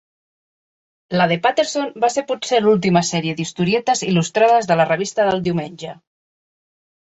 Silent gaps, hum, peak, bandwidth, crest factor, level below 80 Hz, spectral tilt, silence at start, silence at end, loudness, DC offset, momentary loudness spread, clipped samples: none; none; -2 dBFS; 8.2 kHz; 18 dB; -58 dBFS; -5 dB/octave; 1.1 s; 1.25 s; -18 LUFS; under 0.1%; 9 LU; under 0.1%